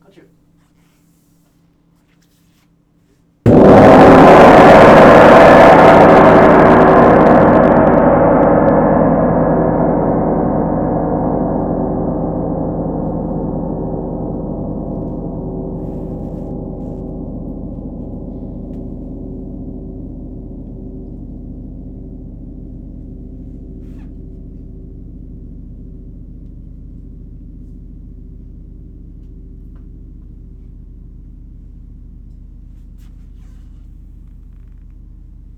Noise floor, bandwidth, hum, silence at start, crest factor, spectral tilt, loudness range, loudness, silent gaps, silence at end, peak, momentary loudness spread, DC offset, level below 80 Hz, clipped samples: -54 dBFS; 13.5 kHz; none; 3.45 s; 12 dB; -8 dB/octave; 26 LU; -9 LUFS; none; 5.6 s; 0 dBFS; 28 LU; under 0.1%; -30 dBFS; 1%